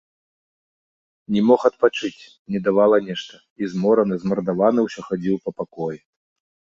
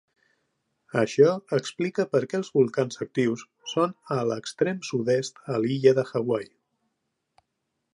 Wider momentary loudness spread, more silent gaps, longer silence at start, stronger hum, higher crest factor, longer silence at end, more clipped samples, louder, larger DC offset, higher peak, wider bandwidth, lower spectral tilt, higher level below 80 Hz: first, 14 LU vs 9 LU; first, 2.39-2.45 s, 3.50-3.56 s vs none; first, 1.3 s vs 0.95 s; neither; about the same, 18 dB vs 20 dB; second, 0.65 s vs 1.5 s; neither; first, -21 LUFS vs -26 LUFS; neither; first, -2 dBFS vs -6 dBFS; second, 7.6 kHz vs 11 kHz; about the same, -7 dB/octave vs -6 dB/octave; first, -62 dBFS vs -74 dBFS